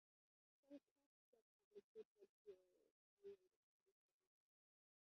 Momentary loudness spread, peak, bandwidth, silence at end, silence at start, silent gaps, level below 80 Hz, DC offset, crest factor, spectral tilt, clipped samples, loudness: 3 LU; -50 dBFS; 5.8 kHz; 1.15 s; 0.65 s; 0.91-0.96 s, 1.06-1.33 s, 1.42-1.71 s, 1.84-1.95 s, 2.05-2.15 s, 2.29-2.45 s, 2.91-3.17 s, 3.56-3.86 s; under -90 dBFS; under 0.1%; 20 dB; -5 dB/octave; under 0.1%; -67 LUFS